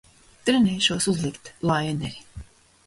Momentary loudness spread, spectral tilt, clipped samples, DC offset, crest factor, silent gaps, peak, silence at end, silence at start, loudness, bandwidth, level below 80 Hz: 14 LU; -4.5 dB/octave; under 0.1%; under 0.1%; 18 dB; none; -6 dBFS; 0.45 s; 0.45 s; -24 LUFS; 11.5 kHz; -50 dBFS